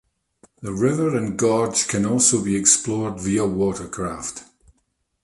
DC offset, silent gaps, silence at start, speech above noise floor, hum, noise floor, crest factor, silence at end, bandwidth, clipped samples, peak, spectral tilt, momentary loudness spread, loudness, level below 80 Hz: under 0.1%; none; 0.6 s; 50 dB; none; -70 dBFS; 20 dB; 0.8 s; 11.5 kHz; under 0.1%; -2 dBFS; -4 dB/octave; 15 LU; -20 LUFS; -50 dBFS